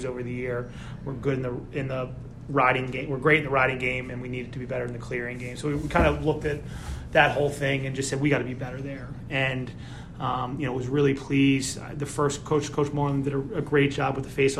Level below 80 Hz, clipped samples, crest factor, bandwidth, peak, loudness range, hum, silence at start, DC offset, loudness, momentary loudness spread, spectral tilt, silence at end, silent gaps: -44 dBFS; under 0.1%; 22 dB; 13 kHz; -4 dBFS; 3 LU; none; 0 s; under 0.1%; -26 LUFS; 12 LU; -5.5 dB/octave; 0 s; none